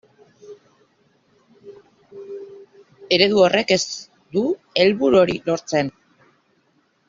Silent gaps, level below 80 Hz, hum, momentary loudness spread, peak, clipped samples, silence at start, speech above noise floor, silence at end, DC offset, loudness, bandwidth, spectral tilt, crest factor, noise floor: none; -60 dBFS; none; 21 LU; -2 dBFS; under 0.1%; 0.5 s; 46 dB; 1.2 s; under 0.1%; -19 LUFS; 7.6 kHz; -3 dB/octave; 20 dB; -63 dBFS